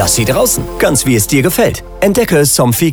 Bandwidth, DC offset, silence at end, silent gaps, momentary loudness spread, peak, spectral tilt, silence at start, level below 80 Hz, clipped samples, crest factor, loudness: over 20 kHz; under 0.1%; 0 s; none; 4 LU; 0 dBFS; -4 dB/octave; 0 s; -30 dBFS; under 0.1%; 10 dB; -11 LUFS